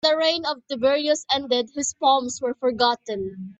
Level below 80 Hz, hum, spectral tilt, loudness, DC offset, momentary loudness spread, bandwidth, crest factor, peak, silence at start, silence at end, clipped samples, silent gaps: -64 dBFS; none; -2 dB/octave; -23 LUFS; under 0.1%; 8 LU; 8.4 kHz; 18 dB; -6 dBFS; 0.05 s; 0.05 s; under 0.1%; none